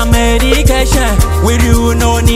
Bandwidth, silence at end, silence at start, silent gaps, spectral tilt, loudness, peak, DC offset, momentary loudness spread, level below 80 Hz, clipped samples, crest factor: 16.5 kHz; 0 s; 0 s; none; -5 dB/octave; -10 LUFS; 0 dBFS; under 0.1%; 2 LU; -12 dBFS; 0.4%; 8 dB